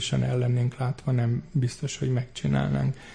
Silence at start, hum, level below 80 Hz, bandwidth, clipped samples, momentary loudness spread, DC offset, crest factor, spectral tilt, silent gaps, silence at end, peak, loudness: 0 s; none; -48 dBFS; 10 kHz; under 0.1%; 4 LU; under 0.1%; 12 dB; -6.5 dB/octave; none; 0 s; -14 dBFS; -27 LUFS